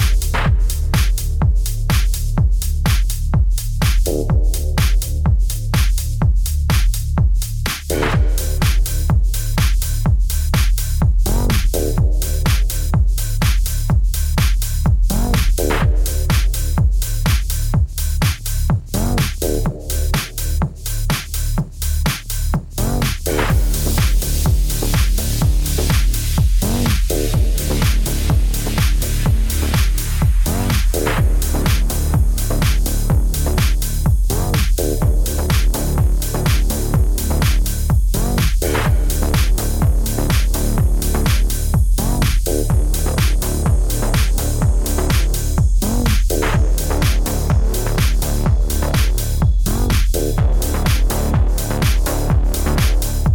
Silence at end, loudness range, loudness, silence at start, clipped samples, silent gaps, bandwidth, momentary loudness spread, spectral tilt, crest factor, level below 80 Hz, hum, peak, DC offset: 0 s; 1 LU; -18 LUFS; 0 s; under 0.1%; none; over 20 kHz; 2 LU; -5 dB/octave; 12 dB; -16 dBFS; none; -4 dBFS; under 0.1%